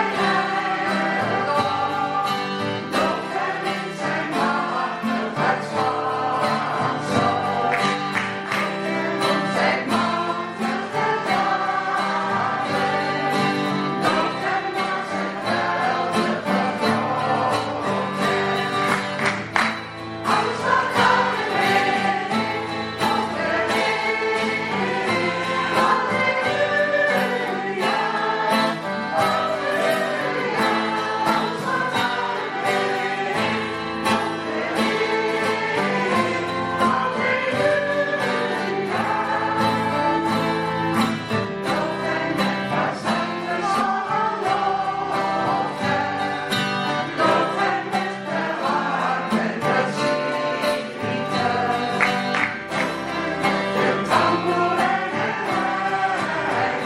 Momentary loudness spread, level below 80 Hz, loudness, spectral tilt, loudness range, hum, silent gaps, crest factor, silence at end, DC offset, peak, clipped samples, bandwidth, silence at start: 4 LU; -60 dBFS; -22 LUFS; -4.5 dB/octave; 2 LU; none; none; 20 dB; 0 s; under 0.1%; -2 dBFS; under 0.1%; 16 kHz; 0 s